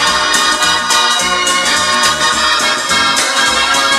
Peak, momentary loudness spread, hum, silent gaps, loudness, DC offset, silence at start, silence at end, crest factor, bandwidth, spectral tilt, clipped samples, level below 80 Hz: 0 dBFS; 1 LU; none; none; -10 LUFS; under 0.1%; 0 s; 0 s; 12 dB; 16.5 kHz; 0 dB/octave; under 0.1%; -42 dBFS